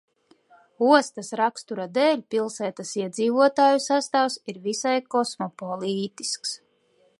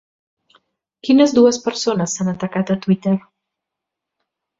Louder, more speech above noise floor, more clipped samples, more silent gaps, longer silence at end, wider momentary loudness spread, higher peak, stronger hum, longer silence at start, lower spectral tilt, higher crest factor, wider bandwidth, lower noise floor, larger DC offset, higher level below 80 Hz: second, -24 LUFS vs -17 LUFS; second, 40 dB vs 66 dB; neither; neither; second, 0.65 s vs 1.4 s; first, 12 LU vs 9 LU; about the same, -2 dBFS vs -2 dBFS; neither; second, 0.8 s vs 1.05 s; second, -3.5 dB/octave vs -5.5 dB/octave; first, 22 dB vs 16 dB; first, 11.5 kHz vs 7.8 kHz; second, -64 dBFS vs -82 dBFS; neither; second, -80 dBFS vs -60 dBFS